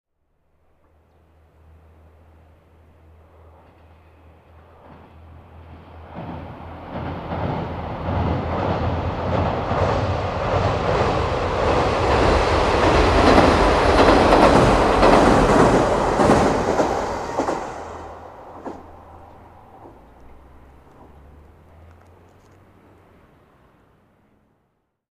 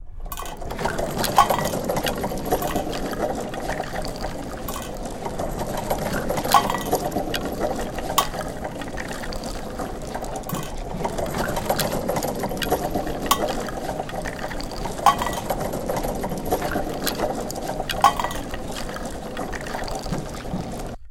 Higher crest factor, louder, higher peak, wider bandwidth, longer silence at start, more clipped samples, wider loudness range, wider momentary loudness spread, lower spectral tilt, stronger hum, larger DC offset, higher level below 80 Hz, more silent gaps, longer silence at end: about the same, 22 dB vs 24 dB; first, -18 LUFS vs -26 LUFS; about the same, 0 dBFS vs 0 dBFS; second, 13 kHz vs 17 kHz; first, 5.55 s vs 0 s; neither; first, 20 LU vs 5 LU; first, 21 LU vs 11 LU; first, -6 dB/octave vs -4 dB/octave; neither; second, under 0.1% vs 0.3%; about the same, -32 dBFS vs -36 dBFS; neither; first, 5.2 s vs 0 s